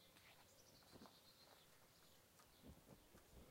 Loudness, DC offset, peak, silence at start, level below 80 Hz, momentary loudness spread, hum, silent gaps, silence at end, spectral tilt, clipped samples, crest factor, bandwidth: -67 LUFS; under 0.1%; -46 dBFS; 0 s; -78 dBFS; 5 LU; none; none; 0 s; -3.5 dB/octave; under 0.1%; 22 dB; 16 kHz